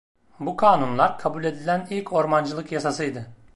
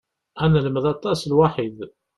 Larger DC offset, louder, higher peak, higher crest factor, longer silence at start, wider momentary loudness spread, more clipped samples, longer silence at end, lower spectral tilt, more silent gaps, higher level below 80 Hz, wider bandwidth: neither; about the same, -23 LUFS vs -21 LUFS; about the same, -4 dBFS vs -4 dBFS; about the same, 20 dB vs 18 dB; second, 0.15 s vs 0.35 s; about the same, 11 LU vs 11 LU; neither; second, 0 s vs 0.3 s; second, -6 dB/octave vs -7.5 dB/octave; neither; second, -62 dBFS vs -48 dBFS; about the same, 11.5 kHz vs 12 kHz